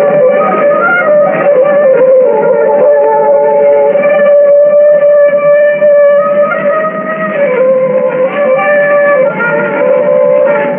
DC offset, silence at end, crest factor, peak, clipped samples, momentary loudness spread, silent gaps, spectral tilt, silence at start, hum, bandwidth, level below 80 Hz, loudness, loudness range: under 0.1%; 0 s; 6 dB; 0 dBFS; under 0.1%; 5 LU; none; -11.5 dB/octave; 0 s; none; 3.3 kHz; -64 dBFS; -7 LUFS; 3 LU